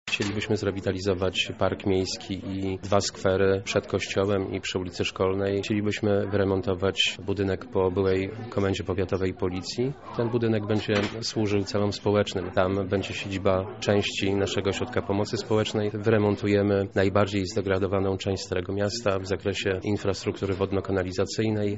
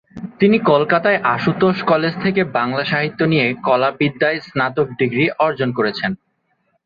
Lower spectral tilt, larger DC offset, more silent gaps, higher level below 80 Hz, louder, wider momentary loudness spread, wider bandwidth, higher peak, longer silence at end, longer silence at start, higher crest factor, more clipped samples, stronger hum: second, -4.5 dB/octave vs -8.5 dB/octave; first, 0.2% vs under 0.1%; neither; about the same, -54 dBFS vs -56 dBFS; second, -26 LUFS vs -17 LUFS; about the same, 5 LU vs 5 LU; first, 8 kHz vs 6.8 kHz; second, -6 dBFS vs -2 dBFS; second, 0 s vs 0.7 s; about the same, 0.05 s vs 0.15 s; about the same, 20 dB vs 16 dB; neither; neither